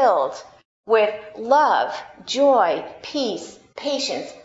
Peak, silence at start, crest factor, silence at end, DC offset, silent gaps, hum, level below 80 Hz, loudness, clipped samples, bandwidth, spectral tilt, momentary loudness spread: -4 dBFS; 0 s; 18 dB; 0.05 s; under 0.1%; 0.65-0.84 s; none; -68 dBFS; -21 LUFS; under 0.1%; 8 kHz; -2.5 dB/octave; 16 LU